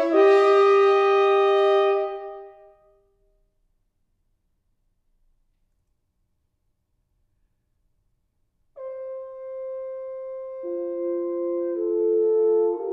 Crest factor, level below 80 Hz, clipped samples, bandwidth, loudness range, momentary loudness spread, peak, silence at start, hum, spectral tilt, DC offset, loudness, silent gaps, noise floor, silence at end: 18 dB; -70 dBFS; under 0.1%; 7.6 kHz; 21 LU; 19 LU; -6 dBFS; 0 s; none; -3.5 dB/octave; under 0.1%; -20 LUFS; none; -72 dBFS; 0 s